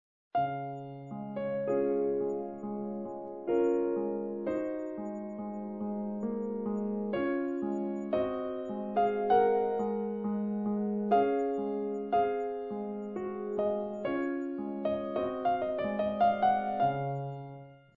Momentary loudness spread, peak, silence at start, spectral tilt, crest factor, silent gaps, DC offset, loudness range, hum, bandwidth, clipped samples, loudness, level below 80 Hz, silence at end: 11 LU; -14 dBFS; 0.35 s; -6.5 dB/octave; 18 dB; none; under 0.1%; 5 LU; none; 7.4 kHz; under 0.1%; -32 LUFS; -68 dBFS; 0.2 s